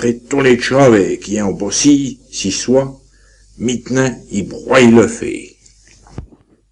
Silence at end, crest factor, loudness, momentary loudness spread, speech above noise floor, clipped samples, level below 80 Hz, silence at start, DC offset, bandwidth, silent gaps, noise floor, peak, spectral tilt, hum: 0.45 s; 14 dB; -13 LUFS; 13 LU; 34 dB; under 0.1%; -44 dBFS; 0 s; under 0.1%; 11 kHz; none; -47 dBFS; 0 dBFS; -4.5 dB/octave; none